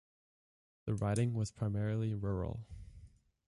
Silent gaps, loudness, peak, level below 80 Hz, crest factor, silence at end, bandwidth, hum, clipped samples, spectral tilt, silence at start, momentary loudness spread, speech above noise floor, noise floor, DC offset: none; -37 LUFS; -24 dBFS; -54 dBFS; 14 dB; 0.4 s; 11.5 kHz; none; under 0.1%; -7.5 dB/octave; 0.85 s; 17 LU; 24 dB; -59 dBFS; under 0.1%